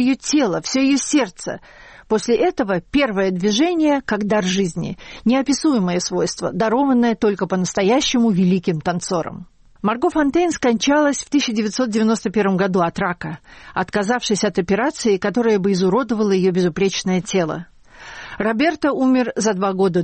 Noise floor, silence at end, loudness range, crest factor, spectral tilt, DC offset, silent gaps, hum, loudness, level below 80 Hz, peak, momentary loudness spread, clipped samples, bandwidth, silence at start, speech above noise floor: -39 dBFS; 0 s; 2 LU; 12 dB; -5 dB/octave; under 0.1%; none; none; -18 LUFS; -48 dBFS; -6 dBFS; 8 LU; under 0.1%; 8.8 kHz; 0 s; 21 dB